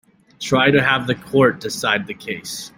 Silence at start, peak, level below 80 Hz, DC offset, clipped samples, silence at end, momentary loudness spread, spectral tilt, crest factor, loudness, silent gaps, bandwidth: 0.4 s; -2 dBFS; -54 dBFS; under 0.1%; under 0.1%; 0.1 s; 13 LU; -4.5 dB/octave; 18 dB; -18 LUFS; none; 16.5 kHz